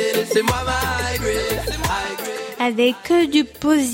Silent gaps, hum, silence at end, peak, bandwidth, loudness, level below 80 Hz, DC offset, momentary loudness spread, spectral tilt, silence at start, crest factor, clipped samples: none; none; 0 s; -4 dBFS; 17 kHz; -20 LUFS; -36 dBFS; under 0.1%; 7 LU; -4 dB/octave; 0 s; 16 dB; under 0.1%